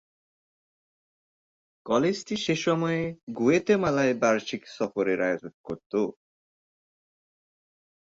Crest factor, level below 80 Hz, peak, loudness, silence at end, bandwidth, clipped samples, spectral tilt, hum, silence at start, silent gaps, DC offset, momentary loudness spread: 18 dB; -64 dBFS; -10 dBFS; -26 LUFS; 1.9 s; 7.8 kHz; under 0.1%; -5.5 dB/octave; none; 1.85 s; 3.23-3.27 s, 5.54-5.64 s, 5.86-5.90 s; under 0.1%; 11 LU